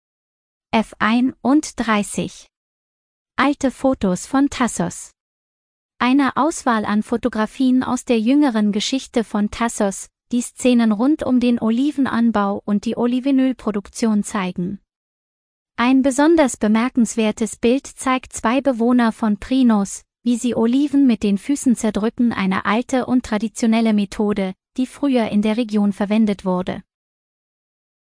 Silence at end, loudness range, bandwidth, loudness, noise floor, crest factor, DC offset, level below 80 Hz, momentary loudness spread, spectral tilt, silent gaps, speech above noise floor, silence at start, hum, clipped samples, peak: 1.25 s; 3 LU; 10.5 kHz; -19 LUFS; under -90 dBFS; 16 dB; under 0.1%; -50 dBFS; 8 LU; -5 dB/octave; 2.57-3.26 s, 5.20-5.89 s, 14.96-15.66 s; over 72 dB; 0.75 s; none; under 0.1%; -2 dBFS